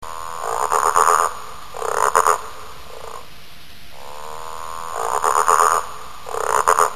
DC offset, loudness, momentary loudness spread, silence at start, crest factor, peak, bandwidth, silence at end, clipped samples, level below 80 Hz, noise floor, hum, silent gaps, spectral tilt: 2%; -18 LUFS; 21 LU; 0 s; 20 dB; 0 dBFS; 14 kHz; 0 s; under 0.1%; -50 dBFS; -43 dBFS; none; none; -1 dB/octave